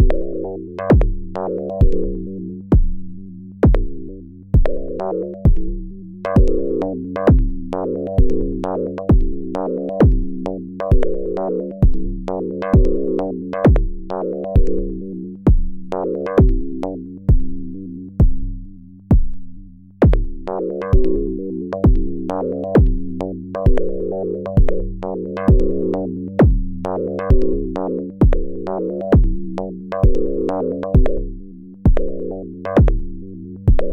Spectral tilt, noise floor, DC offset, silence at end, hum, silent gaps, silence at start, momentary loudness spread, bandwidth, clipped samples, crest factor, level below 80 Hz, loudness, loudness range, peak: -10.5 dB/octave; -37 dBFS; under 0.1%; 0 s; none; none; 0 s; 12 LU; 4.3 kHz; under 0.1%; 12 dB; -20 dBFS; -20 LUFS; 2 LU; -4 dBFS